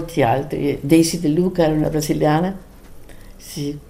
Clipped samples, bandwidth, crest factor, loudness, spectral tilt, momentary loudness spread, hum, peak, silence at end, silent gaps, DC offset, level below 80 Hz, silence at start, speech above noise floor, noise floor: under 0.1%; 16 kHz; 18 dB; -18 LUFS; -6 dB/octave; 12 LU; none; -2 dBFS; 0.05 s; none; under 0.1%; -40 dBFS; 0 s; 20 dB; -38 dBFS